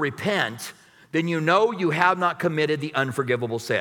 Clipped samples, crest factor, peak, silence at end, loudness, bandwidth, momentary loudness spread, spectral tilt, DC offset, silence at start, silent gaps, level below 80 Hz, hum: under 0.1%; 20 dB; -4 dBFS; 0 s; -23 LUFS; 18.5 kHz; 8 LU; -5.5 dB/octave; under 0.1%; 0 s; none; -70 dBFS; none